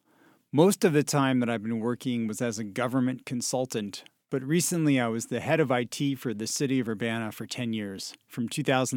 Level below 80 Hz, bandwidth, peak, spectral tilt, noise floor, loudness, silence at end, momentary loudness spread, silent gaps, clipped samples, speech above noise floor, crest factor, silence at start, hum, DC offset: -72 dBFS; 18 kHz; -6 dBFS; -5 dB/octave; -62 dBFS; -28 LUFS; 0 s; 10 LU; none; under 0.1%; 35 dB; 20 dB; 0.55 s; none; under 0.1%